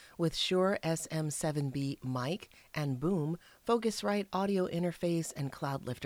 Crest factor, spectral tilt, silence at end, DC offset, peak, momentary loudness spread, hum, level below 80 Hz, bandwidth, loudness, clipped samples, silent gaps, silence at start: 16 dB; -5.5 dB/octave; 0 s; under 0.1%; -16 dBFS; 8 LU; none; -62 dBFS; 18 kHz; -34 LUFS; under 0.1%; none; 0 s